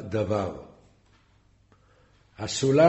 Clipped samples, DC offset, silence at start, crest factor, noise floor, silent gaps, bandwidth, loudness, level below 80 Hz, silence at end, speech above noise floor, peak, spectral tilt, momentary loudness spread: under 0.1%; under 0.1%; 0 s; 20 dB; -62 dBFS; none; 8.2 kHz; -28 LUFS; -58 dBFS; 0 s; 39 dB; -6 dBFS; -5.5 dB/octave; 19 LU